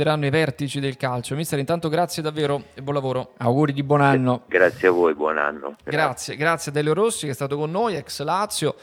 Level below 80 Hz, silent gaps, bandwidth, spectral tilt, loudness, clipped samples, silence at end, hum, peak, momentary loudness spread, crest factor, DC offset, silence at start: -62 dBFS; none; 16.5 kHz; -5.5 dB/octave; -22 LUFS; under 0.1%; 0.1 s; none; -2 dBFS; 8 LU; 20 dB; under 0.1%; 0 s